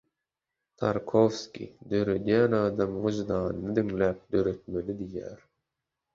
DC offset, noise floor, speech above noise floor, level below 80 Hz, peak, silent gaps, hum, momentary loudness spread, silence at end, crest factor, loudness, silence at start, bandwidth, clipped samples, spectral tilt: under 0.1%; -87 dBFS; 59 dB; -54 dBFS; -8 dBFS; none; none; 13 LU; 0.8 s; 20 dB; -28 LUFS; 0.8 s; 7.6 kHz; under 0.1%; -7 dB/octave